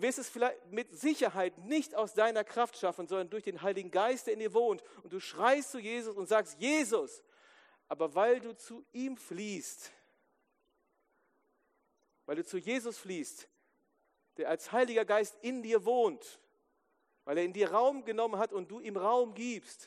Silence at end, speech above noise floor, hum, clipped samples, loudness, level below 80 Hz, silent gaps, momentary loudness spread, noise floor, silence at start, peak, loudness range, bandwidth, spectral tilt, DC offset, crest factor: 0 s; 44 dB; none; under 0.1%; -34 LUFS; under -90 dBFS; none; 14 LU; -78 dBFS; 0 s; -14 dBFS; 10 LU; 14 kHz; -3.5 dB/octave; under 0.1%; 20 dB